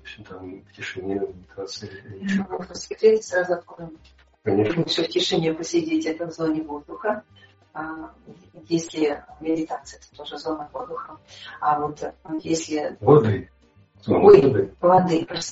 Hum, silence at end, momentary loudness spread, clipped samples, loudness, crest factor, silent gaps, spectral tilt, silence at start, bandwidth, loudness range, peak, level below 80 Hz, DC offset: none; 0 s; 22 LU; under 0.1%; -22 LUFS; 22 dB; none; -5 dB/octave; 0.05 s; 8 kHz; 10 LU; 0 dBFS; -56 dBFS; under 0.1%